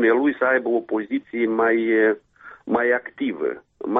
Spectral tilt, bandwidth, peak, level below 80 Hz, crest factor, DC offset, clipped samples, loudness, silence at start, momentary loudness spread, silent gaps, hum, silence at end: -8.5 dB/octave; 3.9 kHz; -8 dBFS; -66 dBFS; 14 dB; under 0.1%; under 0.1%; -22 LUFS; 0 s; 10 LU; none; none; 0 s